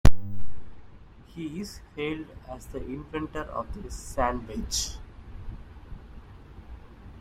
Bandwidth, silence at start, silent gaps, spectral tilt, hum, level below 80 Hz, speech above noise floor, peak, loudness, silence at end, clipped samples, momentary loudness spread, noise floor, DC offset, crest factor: 15.5 kHz; 0.05 s; none; -4.5 dB/octave; none; -36 dBFS; 16 dB; -2 dBFS; -34 LUFS; 0.1 s; under 0.1%; 20 LU; -49 dBFS; under 0.1%; 22 dB